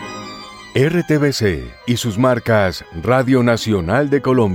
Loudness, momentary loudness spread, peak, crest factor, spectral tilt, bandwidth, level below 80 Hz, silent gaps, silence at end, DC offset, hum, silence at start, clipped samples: -17 LUFS; 11 LU; -4 dBFS; 14 dB; -6 dB/octave; 16.5 kHz; -40 dBFS; none; 0 s; under 0.1%; none; 0 s; under 0.1%